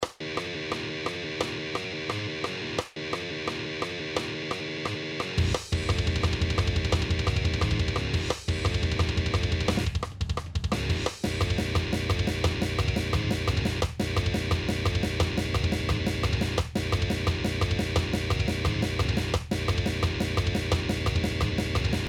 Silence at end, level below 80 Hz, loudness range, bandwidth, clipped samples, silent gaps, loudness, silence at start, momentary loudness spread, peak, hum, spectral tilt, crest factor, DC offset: 0 s; -36 dBFS; 4 LU; 15.5 kHz; under 0.1%; none; -28 LUFS; 0 s; 5 LU; -10 dBFS; none; -5.5 dB/octave; 16 dB; under 0.1%